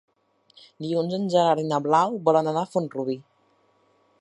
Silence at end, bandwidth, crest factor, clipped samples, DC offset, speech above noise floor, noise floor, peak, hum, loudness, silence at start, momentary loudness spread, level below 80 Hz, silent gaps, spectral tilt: 1 s; 11 kHz; 20 dB; under 0.1%; under 0.1%; 41 dB; -64 dBFS; -6 dBFS; none; -23 LUFS; 0.8 s; 10 LU; -76 dBFS; none; -6.5 dB/octave